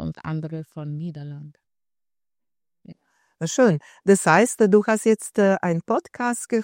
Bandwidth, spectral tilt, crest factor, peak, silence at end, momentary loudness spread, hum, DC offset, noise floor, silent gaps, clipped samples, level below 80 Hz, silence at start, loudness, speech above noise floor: 16 kHz; -5.5 dB/octave; 20 dB; -2 dBFS; 0 s; 16 LU; none; under 0.1%; under -90 dBFS; none; under 0.1%; -60 dBFS; 0 s; -21 LUFS; over 69 dB